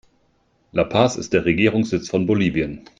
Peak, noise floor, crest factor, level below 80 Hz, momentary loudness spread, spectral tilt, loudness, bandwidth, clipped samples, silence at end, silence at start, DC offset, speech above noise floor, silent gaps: -2 dBFS; -63 dBFS; 18 dB; -48 dBFS; 6 LU; -6 dB/octave; -20 LUFS; 9.2 kHz; under 0.1%; 0.2 s; 0.75 s; under 0.1%; 44 dB; none